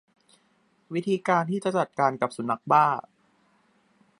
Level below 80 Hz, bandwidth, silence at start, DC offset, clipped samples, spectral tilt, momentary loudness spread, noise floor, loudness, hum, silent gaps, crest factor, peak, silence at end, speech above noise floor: -76 dBFS; 11.5 kHz; 0.9 s; under 0.1%; under 0.1%; -6.5 dB/octave; 10 LU; -66 dBFS; -25 LUFS; none; none; 22 dB; -6 dBFS; 1.2 s; 42 dB